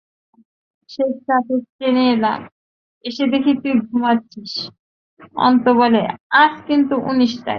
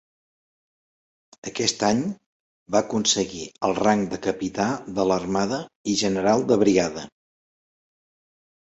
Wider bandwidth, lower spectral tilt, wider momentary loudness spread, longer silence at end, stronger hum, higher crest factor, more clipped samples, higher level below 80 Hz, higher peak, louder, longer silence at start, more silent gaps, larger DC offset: second, 6.6 kHz vs 8.2 kHz; first, -6 dB/octave vs -4 dB/octave; first, 14 LU vs 11 LU; second, 0 s vs 1.55 s; neither; about the same, 16 dB vs 20 dB; neither; second, -62 dBFS vs -56 dBFS; first, -2 dBFS vs -6 dBFS; first, -17 LUFS vs -23 LUFS; second, 0.9 s vs 1.45 s; first, 1.69-1.79 s, 2.52-3.01 s, 4.79-5.17 s, 6.20-6.30 s vs 2.26-2.66 s, 5.75-5.85 s; neither